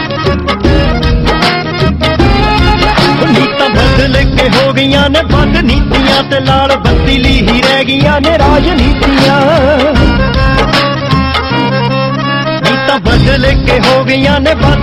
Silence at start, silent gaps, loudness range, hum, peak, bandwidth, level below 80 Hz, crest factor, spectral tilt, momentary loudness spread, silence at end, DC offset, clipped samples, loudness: 0 s; none; 2 LU; none; 0 dBFS; 13.5 kHz; -16 dBFS; 8 dB; -6 dB/octave; 3 LU; 0 s; under 0.1%; under 0.1%; -8 LUFS